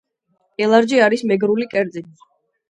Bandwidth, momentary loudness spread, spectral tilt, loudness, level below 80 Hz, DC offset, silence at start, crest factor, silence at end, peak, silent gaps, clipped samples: 10.5 kHz; 14 LU; -5.5 dB/octave; -17 LUFS; -68 dBFS; under 0.1%; 0.6 s; 18 dB; 0.65 s; 0 dBFS; none; under 0.1%